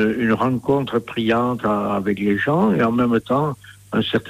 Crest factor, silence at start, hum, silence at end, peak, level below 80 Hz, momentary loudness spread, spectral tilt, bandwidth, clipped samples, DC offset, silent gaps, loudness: 12 dB; 0 s; none; 0 s; -8 dBFS; -52 dBFS; 6 LU; -7.5 dB/octave; 15 kHz; under 0.1%; under 0.1%; none; -20 LUFS